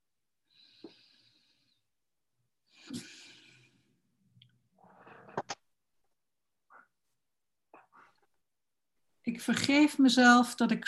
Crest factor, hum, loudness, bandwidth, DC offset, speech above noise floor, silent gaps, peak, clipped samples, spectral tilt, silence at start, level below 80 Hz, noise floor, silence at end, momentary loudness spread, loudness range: 24 dB; none; -26 LUFS; 12.5 kHz; under 0.1%; over 65 dB; none; -10 dBFS; under 0.1%; -3.5 dB/octave; 0.85 s; -80 dBFS; under -90 dBFS; 0.05 s; 23 LU; 25 LU